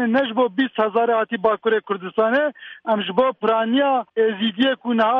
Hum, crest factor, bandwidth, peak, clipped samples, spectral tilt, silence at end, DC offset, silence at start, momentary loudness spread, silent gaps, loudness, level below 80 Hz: none; 14 dB; 5.6 kHz; -6 dBFS; under 0.1%; -7.5 dB/octave; 0 s; under 0.1%; 0 s; 4 LU; none; -20 LUFS; -66 dBFS